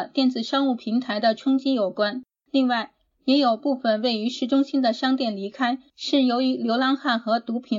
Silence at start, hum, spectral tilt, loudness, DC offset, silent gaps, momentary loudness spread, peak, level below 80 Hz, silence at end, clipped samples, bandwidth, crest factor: 0 s; none; -5 dB/octave; -23 LUFS; under 0.1%; none; 6 LU; -8 dBFS; -76 dBFS; 0 s; under 0.1%; 7.6 kHz; 16 dB